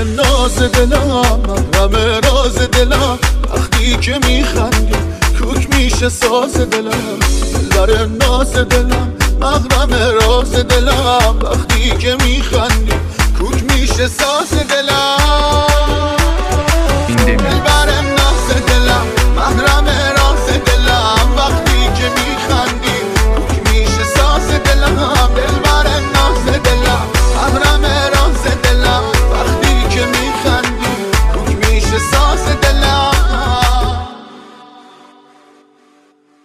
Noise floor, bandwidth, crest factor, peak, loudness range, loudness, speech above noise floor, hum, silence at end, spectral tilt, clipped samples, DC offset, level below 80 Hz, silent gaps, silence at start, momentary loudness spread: -50 dBFS; 16 kHz; 12 dB; 0 dBFS; 2 LU; -12 LUFS; 39 dB; none; 1.8 s; -4 dB/octave; under 0.1%; under 0.1%; -14 dBFS; none; 0 s; 4 LU